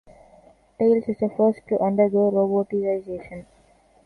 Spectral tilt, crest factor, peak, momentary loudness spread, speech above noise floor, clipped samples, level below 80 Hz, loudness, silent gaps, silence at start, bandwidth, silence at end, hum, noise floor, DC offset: -10.5 dB/octave; 16 dB; -6 dBFS; 15 LU; 36 dB; under 0.1%; -60 dBFS; -22 LUFS; none; 0.8 s; 4.6 kHz; 0.65 s; none; -57 dBFS; under 0.1%